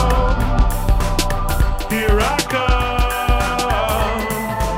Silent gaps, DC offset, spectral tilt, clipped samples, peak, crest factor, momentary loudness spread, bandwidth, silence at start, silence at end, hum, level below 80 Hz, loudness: none; under 0.1%; -4.5 dB/octave; under 0.1%; -2 dBFS; 14 dB; 3 LU; 16.5 kHz; 0 s; 0 s; none; -20 dBFS; -18 LUFS